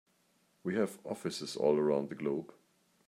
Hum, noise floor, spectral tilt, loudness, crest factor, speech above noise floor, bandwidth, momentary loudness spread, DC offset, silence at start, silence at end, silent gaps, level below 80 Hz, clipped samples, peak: none; -73 dBFS; -5.5 dB/octave; -34 LUFS; 18 dB; 39 dB; 15.5 kHz; 10 LU; under 0.1%; 0.65 s; 0.6 s; none; -80 dBFS; under 0.1%; -16 dBFS